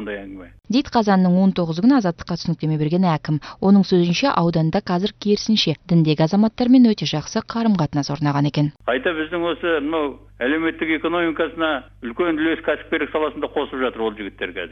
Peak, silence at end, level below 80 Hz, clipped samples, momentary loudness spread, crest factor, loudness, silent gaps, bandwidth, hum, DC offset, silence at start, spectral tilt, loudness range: -4 dBFS; 0 s; -48 dBFS; under 0.1%; 9 LU; 16 dB; -20 LUFS; none; 6.4 kHz; none; under 0.1%; 0 s; -6.5 dB/octave; 4 LU